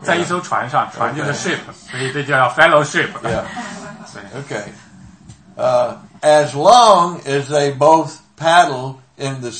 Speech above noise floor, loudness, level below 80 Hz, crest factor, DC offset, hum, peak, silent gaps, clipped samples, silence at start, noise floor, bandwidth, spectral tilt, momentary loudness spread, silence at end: 26 dB; -15 LUFS; -52 dBFS; 16 dB; under 0.1%; none; 0 dBFS; none; 0.1%; 0 s; -42 dBFS; 11 kHz; -4 dB/octave; 18 LU; 0 s